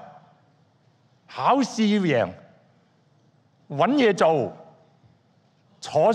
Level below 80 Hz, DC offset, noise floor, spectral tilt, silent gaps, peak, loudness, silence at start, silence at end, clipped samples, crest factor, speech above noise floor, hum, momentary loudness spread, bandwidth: -72 dBFS; under 0.1%; -62 dBFS; -6 dB/octave; none; -6 dBFS; -22 LUFS; 0 s; 0 s; under 0.1%; 20 dB; 41 dB; none; 14 LU; 10 kHz